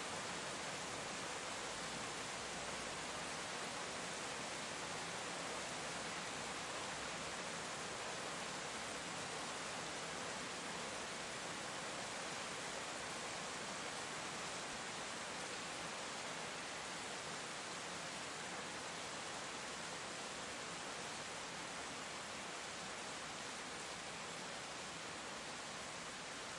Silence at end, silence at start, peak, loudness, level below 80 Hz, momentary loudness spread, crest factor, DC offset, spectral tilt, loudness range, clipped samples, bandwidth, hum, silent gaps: 0 s; 0 s; -32 dBFS; -45 LUFS; -74 dBFS; 2 LU; 14 dB; under 0.1%; -1.5 dB/octave; 2 LU; under 0.1%; 11.5 kHz; none; none